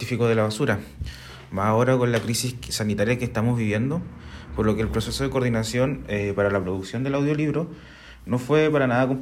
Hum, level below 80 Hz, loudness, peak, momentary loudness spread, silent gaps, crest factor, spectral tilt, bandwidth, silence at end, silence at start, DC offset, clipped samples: none; -44 dBFS; -24 LUFS; -8 dBFS; 14 LU; none; 16 dB; -6 dB/octave; 16 kHz; 0 s; 0 s; under 0.1%; under 0.1%